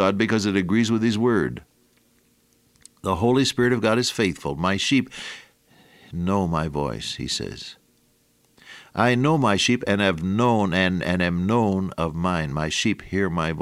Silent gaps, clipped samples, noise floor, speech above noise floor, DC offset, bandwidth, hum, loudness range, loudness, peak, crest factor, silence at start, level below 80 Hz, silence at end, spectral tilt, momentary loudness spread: none; under 0.1%; -63 dBFS; 41 dB; under 0.1%; 15 kHz; none; 6 LU; -22 LUFS; -4 dBFS; 20 dB; 0 s; -48 dBFS; 0 s; -5 dB/octave; 10 LU